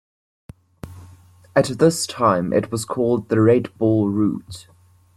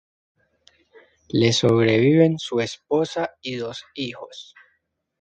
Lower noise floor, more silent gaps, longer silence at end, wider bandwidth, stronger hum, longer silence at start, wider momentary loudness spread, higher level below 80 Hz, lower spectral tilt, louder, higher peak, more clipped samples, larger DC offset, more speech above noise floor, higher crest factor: second, -48 dBFS vs -71 dBFS; neither; second, 0.55 s vs 0.8 s; first, 13.5 kHz vs 9.2 kHz; neither; second, 0.85 s vs 1.35 s; first, 23 LU vs 15 LU; about the same, -54 dBFS vs -58 dBFS; about the same, -6 dB/octave vs -5.5 dB/octave; about the same, -19 LUFS vs -21 LUFS; about the same, -2 dBFS vs -4 dBFS; neither; neither; second, 29 dB vs 51 dB; about the same, 18 dB vs 18 dB